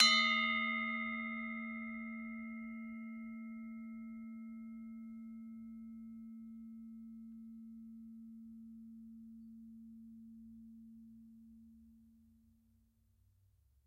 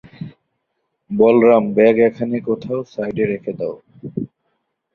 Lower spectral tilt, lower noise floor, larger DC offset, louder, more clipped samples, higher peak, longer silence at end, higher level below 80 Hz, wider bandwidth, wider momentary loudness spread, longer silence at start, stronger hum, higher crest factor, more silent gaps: second, -1.5 dB/octave vs -9 dB/octave; about the same, -73 dBFS vs -73 dBFS; neither; second, -40 LUFS vs -17 LUFS; neither; second, -10 dBFS vs 0 dBFS; first, 1.6 s vs 0.7 s; second, -76 dBFS vs -58 dBFS; first, 12 kHz vs 6 kHz; about the same, 21 LU vs 21 LU; second, 0 s vs 0.2 s; neither; first, 32 dB vs 18 dB; neither